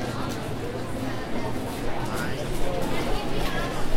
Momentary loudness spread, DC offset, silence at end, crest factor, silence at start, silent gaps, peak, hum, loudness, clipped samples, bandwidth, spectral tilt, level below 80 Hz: 3 LU; under 0.1%; 0 s; 14 dB; 0 s; none; -10 dBFS; none; -30 LUFS; under 0.1%; 16 kHz; -5 dB/octave; -34 dBFS